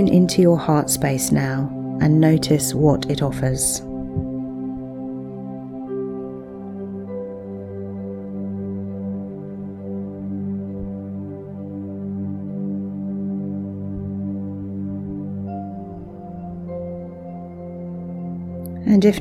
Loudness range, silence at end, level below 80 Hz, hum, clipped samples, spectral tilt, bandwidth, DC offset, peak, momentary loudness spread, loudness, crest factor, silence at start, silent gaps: 12 LU; 0 s; -46 dBFS; none; under 0.1%; -6 dB/octave; 17 kHz; under 0.1%; -2 dBFS; 16 LU; -23 LUFS; 20 dB; 0 s; none